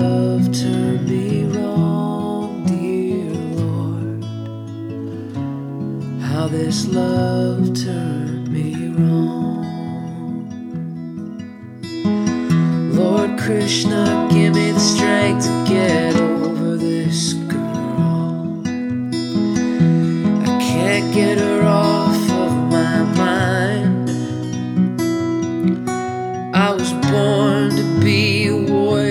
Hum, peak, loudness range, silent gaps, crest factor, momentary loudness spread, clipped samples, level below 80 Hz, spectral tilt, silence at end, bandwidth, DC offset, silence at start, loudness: none; -2 dBFS; 7 LU; none; 16 dB; 11 LU; under 0.1%; -56 dBFS; -6 dB/octave; 0 s; 15 kHz; under 0.1%; 0 s; -18 LUFS